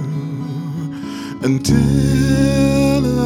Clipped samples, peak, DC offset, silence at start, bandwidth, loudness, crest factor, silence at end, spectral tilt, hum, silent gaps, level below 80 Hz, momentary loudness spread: under 0.1%; -2 dBFS; under 0.1%; 0 s; 15.5 kHz; -17 LUFS; 14 dB; 0 s; -6.5 dB/octave; none; none; -30 dBFS; 11 LU